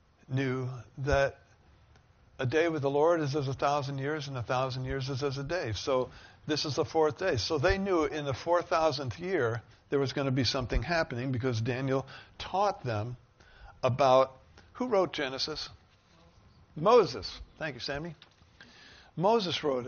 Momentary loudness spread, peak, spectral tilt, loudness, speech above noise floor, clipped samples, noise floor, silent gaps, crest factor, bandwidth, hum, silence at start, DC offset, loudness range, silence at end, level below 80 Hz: 12 LU; -12 dBFS; -4.5 dB/octave; -30 LUFS; 32 dB; under 0.1%; -61 dBFS; none; 20 dB; 6.8 kHz; none; 0.3 s; under 0.1%; 2 LU; 0 s; -48 dBFS